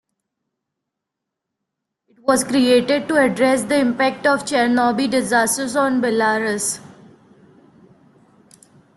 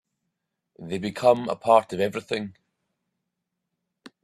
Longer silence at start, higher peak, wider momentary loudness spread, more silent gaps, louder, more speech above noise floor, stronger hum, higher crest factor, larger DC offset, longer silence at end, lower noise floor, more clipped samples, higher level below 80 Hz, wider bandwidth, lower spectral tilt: first, 2.25 s vs 0.8 s; about the same, -2 dBFS vs -4 dBFS; second, 4 LU vs 15 LU; neither; first, -18 LUFS vs -24 LUFS; first, 64 dB vs 58 dB; neither; second, 18 dB vs 24 dB; neither; first, 2.1 s vs 0.15 s; about the same, -82 dBFS vs -82 dBFS; neither; first, -60 dBFS vs -68 dBFS; about the same, 12.5 kHz vs 13.5 kHz; second, -3.5 dB/octave vs -5.5 dB/octave